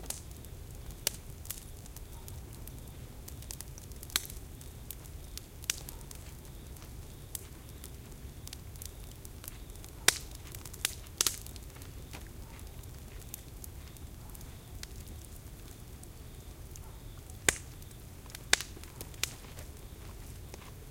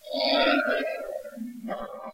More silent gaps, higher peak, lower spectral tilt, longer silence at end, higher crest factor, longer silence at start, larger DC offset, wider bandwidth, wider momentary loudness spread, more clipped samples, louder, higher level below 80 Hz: neither; first, -2 dBFS vs -10 dBFS; second, -1.5 dB/octave vs -3.5 dB/octave; about the same, 0 s vs 0 s; first, 40 dB vs 18 dB; about the same, 0 s vs 0.05 s; neither; about the same, 17 kHz vs 16 kHz; first, 18 LU vs 15 LU; neither; second, -39 LUFS vs -26 LUFS; first, -50 dBFS vs -60 dBFS